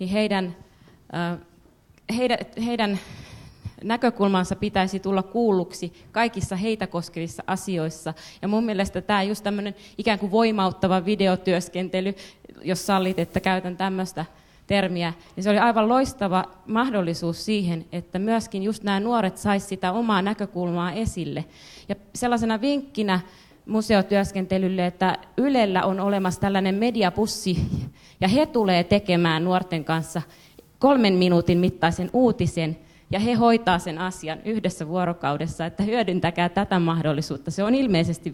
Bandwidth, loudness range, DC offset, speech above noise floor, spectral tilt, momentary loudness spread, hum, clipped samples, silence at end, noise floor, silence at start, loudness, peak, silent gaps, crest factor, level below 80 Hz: 16.5 kHz; 5 LU; under 0.1%; 32 dB; -6 dB/octave; 11 LU; none; under 0.1%; 0 s; -56 dBFS; 0 s; -24 LUFS; -6 dBFS; none; 18 dB; -50 dBFS